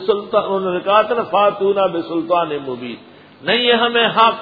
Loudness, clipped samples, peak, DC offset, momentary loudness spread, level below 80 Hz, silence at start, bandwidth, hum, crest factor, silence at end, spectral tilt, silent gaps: -16 LUFS; under 0.1%; 0 dBFS; under 0.1%; 13 LU; -60 dBFS; 0 s; 5 kHz; none; 16 dB; 0 s; -7 dB/octave; none